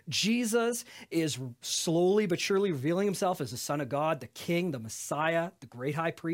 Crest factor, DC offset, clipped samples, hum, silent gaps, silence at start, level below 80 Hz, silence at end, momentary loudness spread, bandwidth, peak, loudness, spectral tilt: 16 dB; under 0.1%; under 0.1%; none; none; 0.05 s; -74 dBFS; 0 s; 9 LU; 16.5 kHz; -14 dBFS; -30 LUFS; -4.5 dB/octave